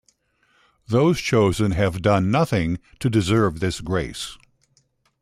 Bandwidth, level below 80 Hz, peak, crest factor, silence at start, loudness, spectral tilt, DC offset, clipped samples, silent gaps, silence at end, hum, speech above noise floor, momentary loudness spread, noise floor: 14 kHz; -44 dBFS; -6 dBFS; 16 dB; 0.9 s; -21 LUFS; -6 dB/octave; under 0.1%; under 0.1%; none; 0.85 s; none; 44 dB; 8 LU; -64 dBFS